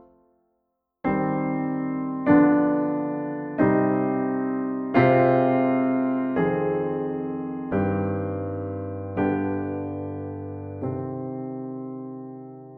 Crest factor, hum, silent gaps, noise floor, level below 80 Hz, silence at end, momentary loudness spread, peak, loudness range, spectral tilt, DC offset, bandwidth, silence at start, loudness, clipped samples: 18 dB; none; none; -76 dBFS; -58 dBFS; 0 s; 15 LU; -6 dBFS; 8 LU; -11 dB/octave; under 0.1%; 4.8 kHz; 1.05 s; -24 LUFS; under 0.1%